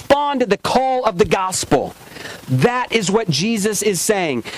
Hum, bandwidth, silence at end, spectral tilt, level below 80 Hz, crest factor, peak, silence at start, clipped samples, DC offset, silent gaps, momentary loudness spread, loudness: none; 16 kHz; 0 s; -4 dB/octave; -44 dBFS; 14 dB; -4 dBFS; 0 s; under 0.1%; under 0.1%; none; 6 LU; -17 LUFS